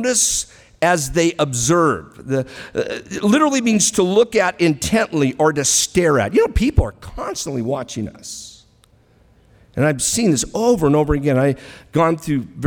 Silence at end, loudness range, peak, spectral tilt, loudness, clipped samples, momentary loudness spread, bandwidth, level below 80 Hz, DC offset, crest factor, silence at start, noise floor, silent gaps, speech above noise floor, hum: 0 s; 7 LU; 0 dBFS; -4 dB/octave; -17 LUFS; under 0.1%; 12 LU; over 20 kHz; -34 dBFS; under 0.1%; 18 dB; 0 s; -54 dBFS; none; 36 dB; none